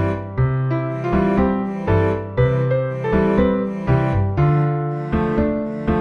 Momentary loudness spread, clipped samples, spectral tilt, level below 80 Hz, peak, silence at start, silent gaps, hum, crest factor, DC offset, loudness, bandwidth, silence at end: 5 LU; under 0.1%; -10 dB/octave; -32 dBFS; -4 dBFS; 0 s; none; none; 14 dB; under 0.1%; -19 LUFS; 6 kHz; 0 s